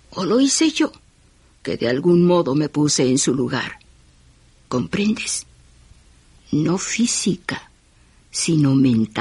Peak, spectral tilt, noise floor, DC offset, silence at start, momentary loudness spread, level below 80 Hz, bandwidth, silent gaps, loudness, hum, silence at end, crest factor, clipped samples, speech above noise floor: -6 dBFS; -4.5 dB/octave; -54 dBFS; under 0.1%; 0.1 s; 11 LU; -52 dBFS; 11.5 kHz; none; -19 LUFS; none; 0 s; 14 dB; under 0.1%; 35 dB